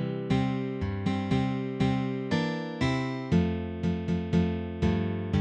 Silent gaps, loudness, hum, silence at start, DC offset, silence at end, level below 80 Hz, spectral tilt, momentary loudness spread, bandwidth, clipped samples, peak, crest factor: none; -29 LUFS; none; 0 s; under 0.1%; 0 s; -44 dBFS; -7.5 dB/octave; 4 LU; 8.6 kHz; under 0.1%; -12 dBFS; 16 dB